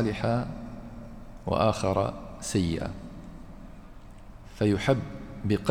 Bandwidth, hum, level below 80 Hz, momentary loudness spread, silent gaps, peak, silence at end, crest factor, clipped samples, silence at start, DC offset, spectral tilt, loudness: 16 kHz; none; -46 dBFS; 23 LU; none; -8 dBFS; 0 s; 20 dB; under 0.1%; 0 s; under 0.1%; -6 dB/octave; -29 LUFS